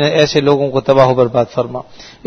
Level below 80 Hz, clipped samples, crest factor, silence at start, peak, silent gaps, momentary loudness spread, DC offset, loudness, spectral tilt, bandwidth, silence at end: -46 dBFS; 0.2%; 14 dB; 0 s; 0 dBFS; none; 10 LU; under 0.1%; -13 LUFS; -6 dB/octave; 6.6 kHz; 0.2 s